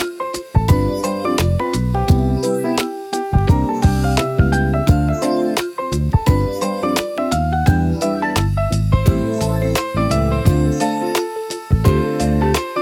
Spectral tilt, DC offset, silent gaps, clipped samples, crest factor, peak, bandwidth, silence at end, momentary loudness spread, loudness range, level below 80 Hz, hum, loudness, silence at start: -6.5 dB/octave; under 0.1%; none; under 0.1%; 14 dB; -4 dBFS; 17.5 kHz; 0 s; 5 LU; 1 LU; -26 dBFS; none; -18 LUFS; 0 s